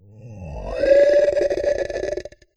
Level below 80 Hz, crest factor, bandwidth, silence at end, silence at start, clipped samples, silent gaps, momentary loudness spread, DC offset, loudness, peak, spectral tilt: -40 dBFS; 16 dB; 8.2 kHz; 0.3 s; 0.15 s; under 0.1%; none; 19 LU; under 0.1%; -19 LUFS; -4 dBFS; -5.5 dB/octave